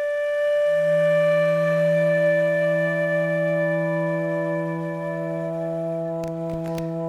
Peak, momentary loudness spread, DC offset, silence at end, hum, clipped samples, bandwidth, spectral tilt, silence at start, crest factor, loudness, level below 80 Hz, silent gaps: -12 dBFS; 9 LU; under 0.1%; 0 s; none; under 0.1%; 12.5 kHz; -7.5 dB/octave; 0 s; 10 dB; -22 LUFS; -58 dBFS; none